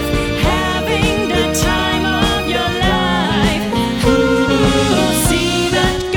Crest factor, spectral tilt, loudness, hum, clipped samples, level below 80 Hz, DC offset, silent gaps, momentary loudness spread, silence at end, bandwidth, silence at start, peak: 14 dB; -4.5 dB/octave; -15 LUFS; none; under 0.1%; -26 dBFS; under 0.1%; none; 3 LU; 0 s; 19.5 kHz; 0 s; 0 dBFS